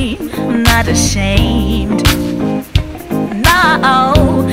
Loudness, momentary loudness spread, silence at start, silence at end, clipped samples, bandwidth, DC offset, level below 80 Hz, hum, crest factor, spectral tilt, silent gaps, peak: -12 LUFS; 9 LU; 0 s; 0 s; 0.3%; 16.5 kHz; 0.7%; -20 dBFS; none; 12 dB; -4.5 dB/octave; none; 0 dBFS